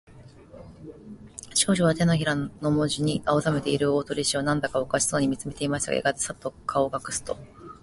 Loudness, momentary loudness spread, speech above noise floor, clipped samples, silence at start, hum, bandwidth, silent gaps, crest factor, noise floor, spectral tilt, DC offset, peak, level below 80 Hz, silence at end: -25 LUFS; 20 LU; 22 dB; under 0.1%; 0.1 s; none; 11.5 kHz; none; 20 dB; -48 dBFS; -4.5 dB/octave; under 0.1%; -6 dBFS; -52 dBFS; 0.1 s